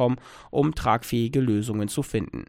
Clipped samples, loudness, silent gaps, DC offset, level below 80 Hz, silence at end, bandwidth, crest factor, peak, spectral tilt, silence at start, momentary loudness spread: under 0.1%; -25 LUFS; none; under 0.1%; -44 dBFS; 0.05 s; 16.5 kHz; 18 dB; -8 dBFS; -6.5 dB/octave; 0 s; 6 LU